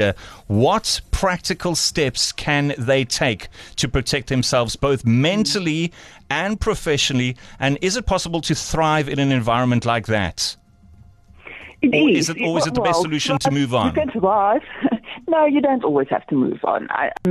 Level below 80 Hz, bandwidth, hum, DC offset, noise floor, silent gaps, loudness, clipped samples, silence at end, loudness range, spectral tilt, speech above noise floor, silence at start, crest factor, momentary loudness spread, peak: -38 dBFS; 13 kHz; none; under 0.1%; -47 dBFS; none; -19 LUFS; under 0.1%; 0 s; 2 LU; -4.5 dB/octave; 28 dB; 0 s; 14 dB; 6 LU; -6 dBFS